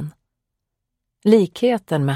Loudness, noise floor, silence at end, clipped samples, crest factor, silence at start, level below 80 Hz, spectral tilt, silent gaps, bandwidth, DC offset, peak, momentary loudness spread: -18 LUFS; -79 dBFS; 0 s; under 0.1%; 20 dB; 0 s; -64 dBFS; -7.5 dB/octave; none; 15 kHz; under 0.1%; -2 dBFS; 9 LU